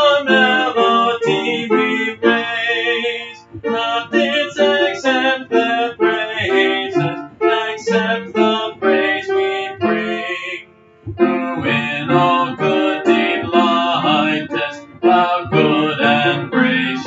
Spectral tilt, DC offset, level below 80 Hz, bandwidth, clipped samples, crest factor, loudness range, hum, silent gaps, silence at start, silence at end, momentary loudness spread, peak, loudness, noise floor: -5.5 dB/octave; under 0.1%; -56 dBFS; 7.8 kHz; under 0.1%; 16 dB; 3 LU; none; none; 0 s; 0 s; 7 LU; 0 dBFS; -16 LUFS; -41 dBFS